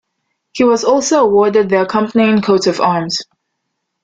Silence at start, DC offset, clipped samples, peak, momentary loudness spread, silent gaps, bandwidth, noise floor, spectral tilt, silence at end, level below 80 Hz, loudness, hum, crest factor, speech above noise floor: 0.55 s; under 0.1%; under 0.1%; 0 dBFS; 7 LU; none; 9.2 kHz; -72 dBFS; -4.5 dB/octave; 0.8 s; -54 dBFS; -13 LUFS; none; 14 dB; 60 dB